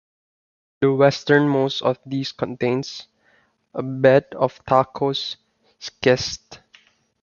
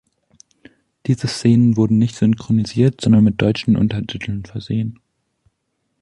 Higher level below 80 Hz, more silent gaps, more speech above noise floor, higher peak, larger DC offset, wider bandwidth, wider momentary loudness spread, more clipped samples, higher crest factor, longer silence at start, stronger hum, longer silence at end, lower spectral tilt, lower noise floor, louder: second, -56 dBFS vs -46 dBFS; neither; second, 41 dB vs 55 dB; about the same, -2 dBFS vs -2 dBFS; neither; second, 7.2 kHz vs 11 kHz; first, 17 LU vs 12 LU; neither; first, 20 dB vs 14 dB; second, 0.8 s vs 1.05 s; neither; second, 0.65 s vs 1.1 s; second, -5.5 dB/octave vs -7 dB/octave; second, -61 dBFS vs -71 dBFS; second, -20 LUFS vs -17 LUFS